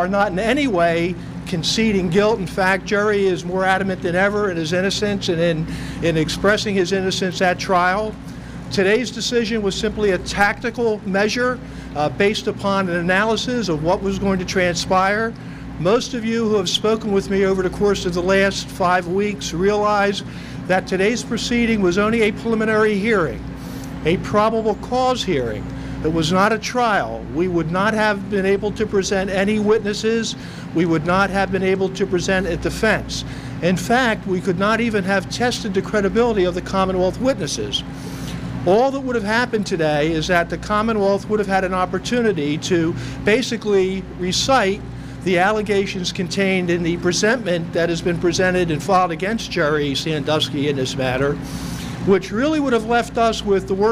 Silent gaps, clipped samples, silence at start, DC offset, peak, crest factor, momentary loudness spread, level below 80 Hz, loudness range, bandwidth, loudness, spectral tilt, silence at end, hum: none; under 0.1%; 0 s; under 0.1%; -2 dBFS; 18 dB; 6 LU; -40 dBFS; 1 LU; 15.5 kHz; -19 LUFS; -5 dB/octave; 0 s; none